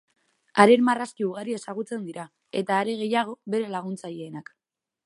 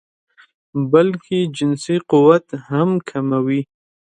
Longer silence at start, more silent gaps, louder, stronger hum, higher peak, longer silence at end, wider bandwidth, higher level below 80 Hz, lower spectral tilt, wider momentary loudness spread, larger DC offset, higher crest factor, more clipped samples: second, 0.55 s vs 0.75 s; neither; second, -25 LUFS vs -17 LUFS; neither; about the same, 0 dBFS vs 0 dBFS; first, 0.65 s vs 0.5 s; about the same, 11.5 kHz vs 10.5 kHz; second, -76 dBFS vs -62 dBFS; second, -5.5 dB/octave vs -7 dB/octave; first, 20 LU vs 10 LU; neither; first, 26 dB vs 18 dB; neither